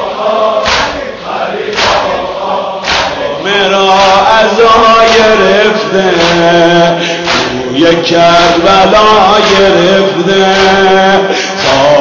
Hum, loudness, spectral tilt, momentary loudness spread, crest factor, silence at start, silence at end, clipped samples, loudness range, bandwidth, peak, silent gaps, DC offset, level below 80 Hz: none; -7 LUFS; -4 dB/octave; 9 LU; 8 dB; 0 s; 0 s; 0.9%; 5 LU; 8 kHz; 0 dBFS; none; under 0.1%; -34 dBFS